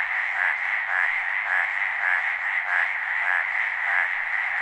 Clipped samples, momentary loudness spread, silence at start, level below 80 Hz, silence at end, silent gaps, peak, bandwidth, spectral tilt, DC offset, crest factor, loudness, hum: under 0.1%; 2 LU; 0 s; -68 dBFS; 0 s; none; -6 dBFS; 9.6 kHz; 0 dB/octave; under 0.1%; 18 dB; -23 LUFS; none